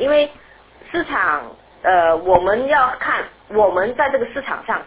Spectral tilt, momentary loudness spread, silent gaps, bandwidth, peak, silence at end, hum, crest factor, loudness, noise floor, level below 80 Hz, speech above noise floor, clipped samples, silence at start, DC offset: -8 dB/octave; 9 LU; none; 4 kHz; 0 dBFS; 0 s; none; 18 dB; -18 LUFS; -46 dBFS; -48 dBFS; 28 dB; under 0.1%; 0 s; under 0.1%